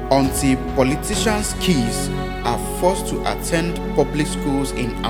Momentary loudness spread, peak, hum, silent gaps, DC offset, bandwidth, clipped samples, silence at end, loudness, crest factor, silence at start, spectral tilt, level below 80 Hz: 5 LU; -2 dBFS; none; none; under 0.1%; 19 kHz; under 0.1%; 0 s; -20 LUFS; 18 dB; 0 s; -4.5 dB/octave; -30 dBFS